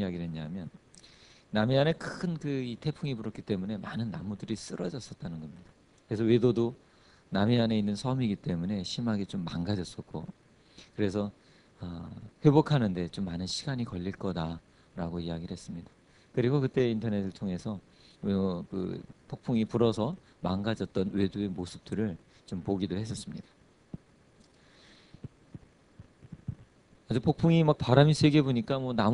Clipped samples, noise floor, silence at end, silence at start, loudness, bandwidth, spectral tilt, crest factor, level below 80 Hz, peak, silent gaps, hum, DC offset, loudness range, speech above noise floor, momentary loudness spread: under 0.1%; -61 dBFS; 0 s; 0 s; -31 LUFS; 11 kHz; -7 dB/octave; 24 dB; -58 dBFS; -6 dBFS; none; none; under 0.1%; 8 LU; 31 dB; 19 LU